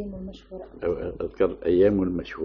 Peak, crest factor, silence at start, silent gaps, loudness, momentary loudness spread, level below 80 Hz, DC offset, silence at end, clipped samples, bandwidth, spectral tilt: -10 dBFS; 16 dB; 0 s; none; -25 LUFS; 19 LU; -46 dBFS; under 0.1%; 0 s; under 0.1%; 6.2 kHz; -7 dB/octave